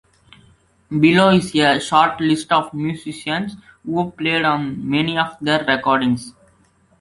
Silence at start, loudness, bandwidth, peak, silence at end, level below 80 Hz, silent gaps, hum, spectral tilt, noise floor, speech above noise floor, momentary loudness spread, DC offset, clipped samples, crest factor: 0.9 s; -18 LUFS; 11.5 kHz; 0 dBFS; 0.7 s; -54 dBFS; none; none; -5.5 dB/octave; -57 dBFS; 39 dB; 11 LU; under 0.1%; under 0.1%; 18 dB